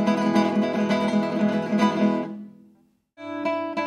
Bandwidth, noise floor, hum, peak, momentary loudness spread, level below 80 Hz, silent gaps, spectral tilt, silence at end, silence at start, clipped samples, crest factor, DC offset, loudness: 10 kHz; -60 dBFS; none; -6 dBFS; 14 LU; -74 dBFS; none; -6.5 dB/octave; 0 s; 0 s; under 0.1%; 18 dB; under 0.1%; -23 LUFS